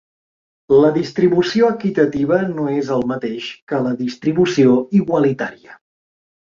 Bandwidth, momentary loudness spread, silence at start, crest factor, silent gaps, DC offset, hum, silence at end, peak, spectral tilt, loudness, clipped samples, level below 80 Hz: 7.6 kHz; 10 LU; 0.7 s; 16 dB; 3.62-3.67 s; under 0.1%; none; 0.85 s; -2 dBFS; -7 dB/octave; -17 LUFS; under 0.1%; -54 dBFS